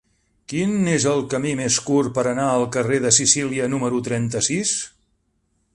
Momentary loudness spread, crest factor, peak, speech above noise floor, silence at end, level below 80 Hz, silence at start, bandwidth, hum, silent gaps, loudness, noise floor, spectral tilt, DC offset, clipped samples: 8 LU; 20 dB; -2 dBFS; 48 dB; 0.85 s; -54 dBFS; 0.5 s; 11.5 kHz; none; none; -20 LUFS; -68 dBFS; -3.5 dB/octave; under 0.1%; under 0.1%